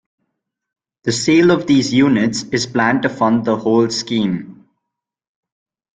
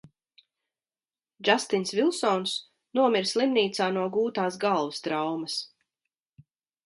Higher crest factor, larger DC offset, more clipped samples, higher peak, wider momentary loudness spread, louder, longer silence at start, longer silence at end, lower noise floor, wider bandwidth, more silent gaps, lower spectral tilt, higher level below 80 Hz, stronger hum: second, 16 dB vs 24 dB; neither; neither; about the same, -2 dBFS vs -4 dBFS; about the same, 8 LU vs 8 LU; first, -16 LUFS vs -27 LUFS; second, 1.05 s vs 1.4 s; first, 1.45 s vs 1.2 s; second, -81 dBFS vs under -90 dBFS; second, 9.4 kHz vs 11.5 kHz; neither; about the same, -5 dB/octave vs -4 dB/octave; first, -54 dBFS vs -78 dBFS; neither